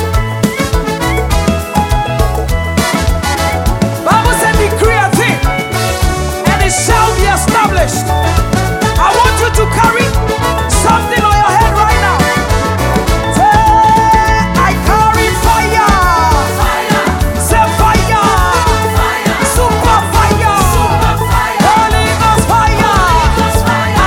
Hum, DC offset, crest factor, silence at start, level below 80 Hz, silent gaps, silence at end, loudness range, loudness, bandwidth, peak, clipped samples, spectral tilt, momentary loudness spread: none; under 0.1%; 10 dB; 0 s; -18 dBFS; none; 0 s; 2 LU; -10 LUFS; 17.5 kHz; 0 dBFS; under 0.1%; -4.5 dB/octave; 5 LU